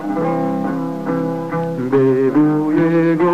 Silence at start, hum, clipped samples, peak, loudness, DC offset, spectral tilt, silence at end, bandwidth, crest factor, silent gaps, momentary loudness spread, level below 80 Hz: 0 s; none; under 0.1%; -4 dBFS; -17 LUFS; 0.6%; -9 dB/octave; 0 s; 8.4 kHz; 12 dB; none; 7 LU; -56 dBFS